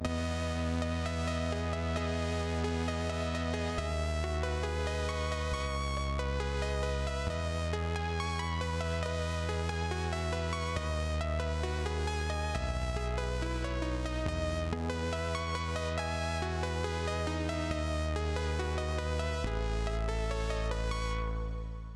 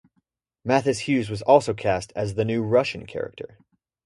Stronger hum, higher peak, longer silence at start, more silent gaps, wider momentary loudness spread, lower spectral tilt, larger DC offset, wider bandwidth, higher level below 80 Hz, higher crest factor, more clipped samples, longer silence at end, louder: neither; second, -20 dBFS vs -2 dBFS; second, 0 s vs 0.65 s; neither; second, 1 LU vs 15 LU; about the same, -5.5 dB/octave vs -6 dB/octave; neither; about the same, 12 kHz vs 11.5 kHz; first, -38 dBFS vs -54 dBFS; second, 14 dB vs 22 dB; neither; second, 0 s vs 0.6 s; second, -34 LUFS vs -23 LUFS